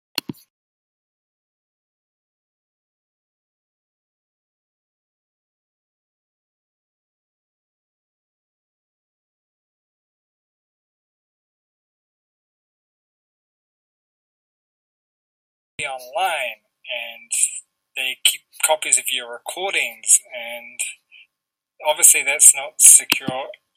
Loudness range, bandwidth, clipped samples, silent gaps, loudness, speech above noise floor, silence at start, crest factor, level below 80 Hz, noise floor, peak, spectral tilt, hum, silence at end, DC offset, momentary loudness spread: 16 LU; 16 kHz; under 0.1%; 0.50-15.78 s; -15 LUFS; 65 dB; 0.15 s; 24 dB; -76 dBFS; -83 dBFS; 0 dBFS; 1 dB/octave; none; 0.25 s; under 0.1%; 19 LU